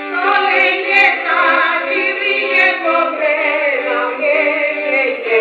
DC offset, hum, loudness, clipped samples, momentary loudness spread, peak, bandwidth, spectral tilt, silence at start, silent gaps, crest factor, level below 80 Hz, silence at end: under 0.1%; none; -13 LUFS; under 0.1%; 5 LU; 0 dBFS; 7.8 kHz; -2.5 dB/octave; 0 s; none; 14 dB; -68 dBFS; 0 s